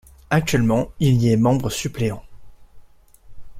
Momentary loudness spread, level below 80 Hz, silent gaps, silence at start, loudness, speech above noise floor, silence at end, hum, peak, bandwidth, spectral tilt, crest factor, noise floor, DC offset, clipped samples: 9 LU; -42 dBFS; none; 0.3 s; -20 LUFS; 29 dB; 0 s; none; -4 dBFS; 15.5 kHz; -6 dB/octave; 18 dB; -47 dBFS; under 0.1%; under 0.1%